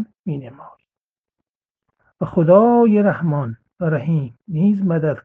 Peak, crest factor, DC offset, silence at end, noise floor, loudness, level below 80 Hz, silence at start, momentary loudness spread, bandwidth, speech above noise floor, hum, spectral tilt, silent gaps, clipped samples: 0 dBFS; 18 dB; under 0.1%; 0.05 s; under -90 dBFS; -17 LUFS; -58 dBFS; 0 s; 16 LU; 3.6 kHz; over 73 dB; none; -12 dB/octave; 0.19-0.24 s, 1.01-1.23 s, 1.49-1.60 s, 1.70-1.75 s; under 0.1%